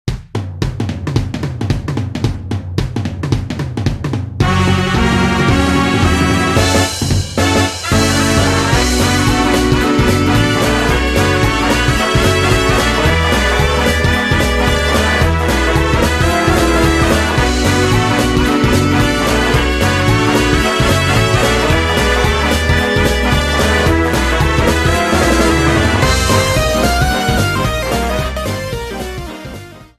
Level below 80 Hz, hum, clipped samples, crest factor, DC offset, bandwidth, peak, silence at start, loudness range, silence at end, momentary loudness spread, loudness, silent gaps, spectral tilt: -22 dBFS; none; under 0.1%; 12 dB; under 0.1%; 15 kHz; 0 dBFS; 0.05 s; 4 LU; 0.15 s; 8 LU; -13 LUFS; none; -5 dB/octave